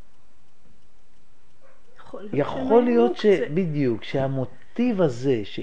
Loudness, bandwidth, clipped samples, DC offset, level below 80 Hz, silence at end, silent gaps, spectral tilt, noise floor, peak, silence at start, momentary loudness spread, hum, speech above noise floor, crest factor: -23 LUFS; 9 kHz; under 0.1%; 2%; -58 dBFS; 0 s; none; -8 dB/octave; -62 dBFS; -6 dBFS; 2.15 s; 11 LU; none; 40 dB; 18 dB